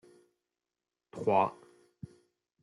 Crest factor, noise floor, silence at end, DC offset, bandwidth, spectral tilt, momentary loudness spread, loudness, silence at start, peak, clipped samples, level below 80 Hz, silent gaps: 24 dB; under -90 dBFS; 1.1 s; under 0.1%; 11.5 kHz; -7.5 dB/octave; 23 LU; -31 LUFS; 1.15 s; -14 dBFS; under 0.1%; -78 dBFS; none